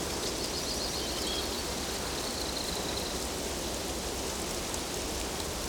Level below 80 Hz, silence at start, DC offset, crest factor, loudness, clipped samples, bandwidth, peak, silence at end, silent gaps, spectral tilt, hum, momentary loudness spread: -44 dBFS; 0 s; under 0.1%; 16 dB; -33 LUFS; under 0.1%; over 20 kHz; -18 dBFS; 0 s; none; -2.5 dB/octave; none; 2 LU